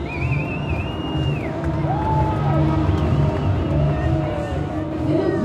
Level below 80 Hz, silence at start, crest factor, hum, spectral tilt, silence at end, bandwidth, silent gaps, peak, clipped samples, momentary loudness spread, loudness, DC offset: -30 dBFS; 0 s; 14 dB; none; -8.5 dB/octave; 0 s; 8.4 kHz; none; -6 dBFS; under 0.1%; 6 LU; -21 LUFS; under 0.1%